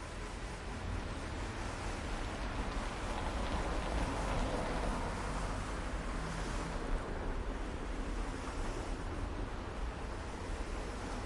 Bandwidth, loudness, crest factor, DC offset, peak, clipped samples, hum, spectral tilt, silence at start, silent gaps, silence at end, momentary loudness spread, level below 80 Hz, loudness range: 11.5 kHz; -41 LUFS; 14 dB; under 0.1%; -24 dBFS; under 0.1%; none; -5 dB/octave; 0 s; none; 0 s; 6 LU; -42 dBFS; 4 LU